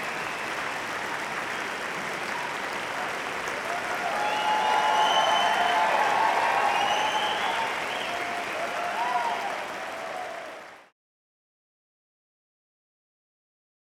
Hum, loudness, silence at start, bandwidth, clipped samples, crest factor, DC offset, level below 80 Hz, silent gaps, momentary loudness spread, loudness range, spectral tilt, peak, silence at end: none; -26 LUFS; 0 s; 18 kHz; under 0.1%; 18 dB; under 0.1%; -66 dBFS; none; 11 LU; 13 LU; -1.5 dB/octave; -10 dBFS; 3.1 s